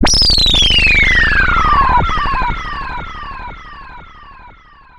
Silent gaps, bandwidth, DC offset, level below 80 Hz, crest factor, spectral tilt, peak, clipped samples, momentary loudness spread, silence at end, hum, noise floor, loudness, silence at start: none; 13 kHz; under 0.1%; -20 dBFS; 14 dB; -2 dB/octave; 0 dBFS; under 0.1%; 19 LU; 0.45 s; none; -41 dBFS; -10 LUFS; 0 s